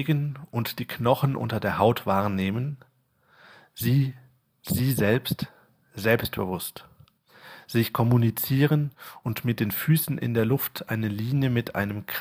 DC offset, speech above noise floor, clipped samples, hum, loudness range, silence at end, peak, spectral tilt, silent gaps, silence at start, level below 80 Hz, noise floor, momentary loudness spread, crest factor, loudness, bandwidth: under 0.1%; 39 dB; under 0.1%; none; 3 LU; 0 s; -6 dBFS; -6.5 dB/octave; none; 0 s; -58 dBFS; -64 dBFS; 10 LU; 20 dB; -26 LUFS; 16 kHz